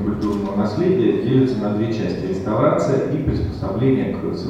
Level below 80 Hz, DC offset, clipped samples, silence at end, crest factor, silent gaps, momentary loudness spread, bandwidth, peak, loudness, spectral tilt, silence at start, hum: -38 dBFS; under 0.1%; under 0.1%; 0 s; 16 dB; none; 6 LU; 9 kHz; -4 dBFS; -20 LUFS; -8.5 dB/octave; 0 s; none